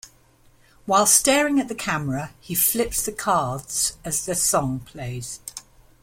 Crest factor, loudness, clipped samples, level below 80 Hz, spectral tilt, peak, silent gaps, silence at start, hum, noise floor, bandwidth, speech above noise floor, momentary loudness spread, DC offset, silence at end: 20 dB; -21 LUFS; under 0.1%; -48 dBFS; -3 dB/octave; -4 dBFS; none; 0.05 s; none; -56 dBFS; 16.5 kHz; 33 dB; 17 LU; under 0.1%; 0.4 s